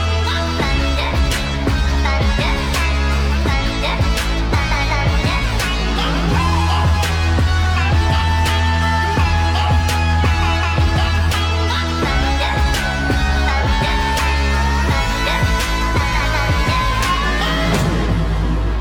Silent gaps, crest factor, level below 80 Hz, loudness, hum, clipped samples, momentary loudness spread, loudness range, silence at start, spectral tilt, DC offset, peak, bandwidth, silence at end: none; 12 dB; -20 dBFS; -17 LUFS; none; under 0.1%; 2 LU; 2 LU; 0 s; -5 dB/octave; under 0.1%; -4 dBFS; 17 kHz; 0 s